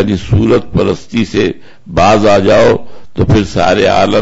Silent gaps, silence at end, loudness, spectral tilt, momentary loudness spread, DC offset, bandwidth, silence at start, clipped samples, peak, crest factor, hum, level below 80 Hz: none; 0 s; -10 LUFS; -6.5 dB/octave; 9 LU; under 0.1%; 8 kHz; 0 s; under 0.1%; 0 dBFS; 8 dB; none; -28 dBFS